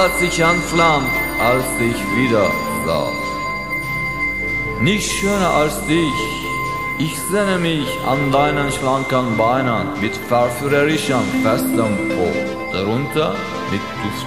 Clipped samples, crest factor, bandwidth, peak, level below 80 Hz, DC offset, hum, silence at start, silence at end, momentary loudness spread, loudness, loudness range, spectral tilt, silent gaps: under 0.1%; 16 dB; 14 kHz; -2 dBFS; -38 dBFS; 0.7%; none; 0 s; 0 s; 6 LU; -18 LUFS; 2 LU; -4.5 dB/octave; none